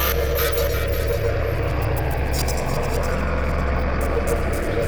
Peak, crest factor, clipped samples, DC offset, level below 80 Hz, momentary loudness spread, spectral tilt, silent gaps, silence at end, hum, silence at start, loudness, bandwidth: -10 dBFS; 12 dB; under 0.1%; under 0.1%; -24 dBFS; 3 LU; -5.5 dB/octave; none; 0 s; none; 0 s; -23 LUFS; over 20 kHz